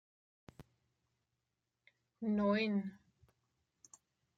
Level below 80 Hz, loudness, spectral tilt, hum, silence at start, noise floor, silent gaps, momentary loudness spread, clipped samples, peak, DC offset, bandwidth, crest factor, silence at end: -74 dBFS; -37 LUFS; -6.5 dB/octave; none; 0.6 s; -88 dBFS; none; 11 LU; under 0.1%; -24 dBFS; under 0.1%; 7.8 kHz; 18 dB; 1.45 s